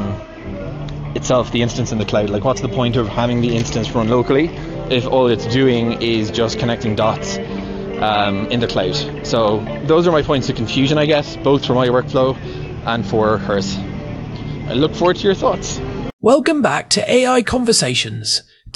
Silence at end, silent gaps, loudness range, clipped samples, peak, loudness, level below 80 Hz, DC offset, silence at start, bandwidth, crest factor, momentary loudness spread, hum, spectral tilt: 0.05 s; 16.13-16.19 s; 3 LU; under 0.1%; -2 dBFS; -17 LUFS; -36 dBFS; under 0.1%; 0 s; 12 kHz; 16 dB; 12 LU; none; -5 dB/octave